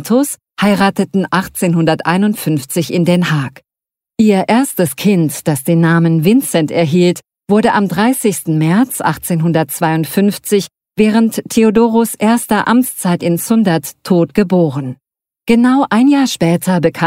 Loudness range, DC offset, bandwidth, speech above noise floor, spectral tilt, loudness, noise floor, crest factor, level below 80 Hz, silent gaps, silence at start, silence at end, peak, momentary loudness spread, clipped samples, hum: 2 LU; under 0.1%; 16.5 kHz; 75 dB; -6 dB/octave; -13 LUFS; -87 dBFS; 12 dB; -50 dBFS; none; 0 s; 0 s; 0 dBFS; 6 LU; under 0.1%; none